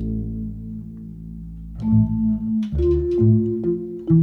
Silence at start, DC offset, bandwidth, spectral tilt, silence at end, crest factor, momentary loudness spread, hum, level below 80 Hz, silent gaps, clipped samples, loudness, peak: 0 s; under 0.1%; 4.2 kHz; -12 dB/octave; 0 s; 14 dB; 18 LU; none; -32 dBFS; none; under 0.1%; -21 LUFS; -6 dBFS